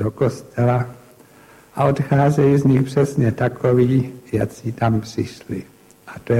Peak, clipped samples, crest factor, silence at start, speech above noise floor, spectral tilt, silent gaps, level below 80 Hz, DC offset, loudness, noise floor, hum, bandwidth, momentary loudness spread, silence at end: -4 dBFS; under 0.1%; 16 dB; 0 s; 29 dB; -8 dB/octave; none; -48 dBFS; under 0.1%; -19 LUFS; -48 dBFS; none; 13.5 kHz; 15 LU; 0 s